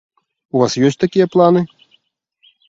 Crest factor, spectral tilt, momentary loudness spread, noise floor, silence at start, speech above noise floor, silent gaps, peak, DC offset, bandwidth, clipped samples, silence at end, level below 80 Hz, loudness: 16 dB; -6.5 dB/octave; 8 LU; -61 dBFS; 0.55 s; 47 dB; none; 0 dBFS; under 0.1%; 7.8 kHz; under 0.1%; 1.05 s; -58 dBFS; -15 LUFS